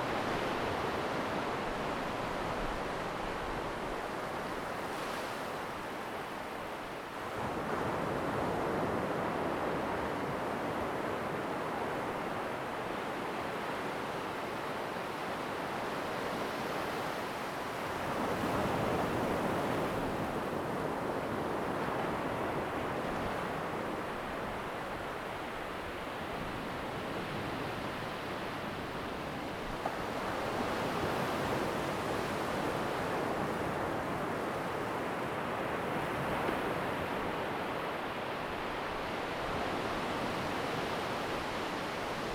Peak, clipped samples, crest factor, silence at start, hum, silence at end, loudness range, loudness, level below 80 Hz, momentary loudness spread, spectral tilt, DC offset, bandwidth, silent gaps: -20 dBFS; under 0.1%; 16 dB; 0 s; none; 0 s; 4 LU; -36 LUFS; -56 dBFS; 5 LU; -5 dB/octave; under 0.1%; over 20 kHz; none